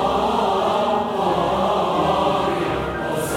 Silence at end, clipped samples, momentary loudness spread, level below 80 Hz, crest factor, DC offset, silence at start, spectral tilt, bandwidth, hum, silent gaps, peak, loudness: 0 s; under 0.1%; 4 LU; -42 dBFS; 14 dB; under 0.1%; 0 s; -5 dB/octave; 16.5 kHz; none; none; -6 dBFS; -20 LUFS